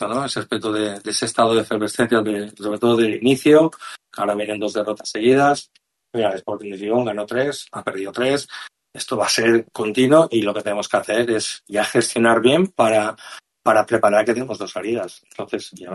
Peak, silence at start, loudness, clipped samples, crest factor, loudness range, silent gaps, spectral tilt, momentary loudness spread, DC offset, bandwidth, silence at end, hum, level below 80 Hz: -2 dBFS; 0 s; -19 LUFS; under 0.1%; 18 dB; 4 LU; none; -4.5 dB/octave; 13 LU; under 0.1%; 12.5 kHz; 0 s; none; -64 dBFS